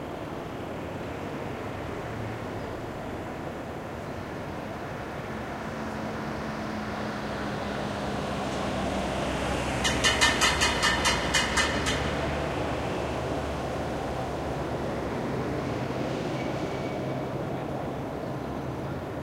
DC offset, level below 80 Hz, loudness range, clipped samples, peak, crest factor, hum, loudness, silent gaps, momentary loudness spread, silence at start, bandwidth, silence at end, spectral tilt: under 0.1%; -44 dBFS; 11 LU; under 0.1%; -6 dBFS; 24 dB; none; -30 LUFS; none; 13 LU; 0 s; 16 kHz; 0 s; -4 dB/octave